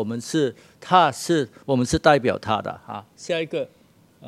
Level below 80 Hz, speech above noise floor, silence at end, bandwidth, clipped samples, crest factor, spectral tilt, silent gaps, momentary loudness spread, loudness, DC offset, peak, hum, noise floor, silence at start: -48 dBFS; 30 dB; 0 s; 14.5 kHz; under 0.1%; 22 dB; -5 dB/octave; none; 18 LU; -22 LUFS; under 0.1%; 0 dBFS; none; -52 dBFS; 0 s